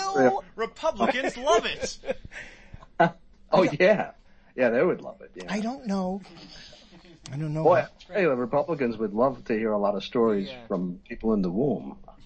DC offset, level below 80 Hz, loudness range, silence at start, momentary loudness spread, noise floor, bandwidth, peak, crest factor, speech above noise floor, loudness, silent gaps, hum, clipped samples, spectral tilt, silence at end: under 0.1%; -52 dBFS; 4 LU; 0 s; 19 LU; -51 dBFS; 8.8 kHz; -6 dBFS; 20 dB; 25 dB; -26 LUFS; none; none; under 0.1%; -5.5 dB/octave; 0 s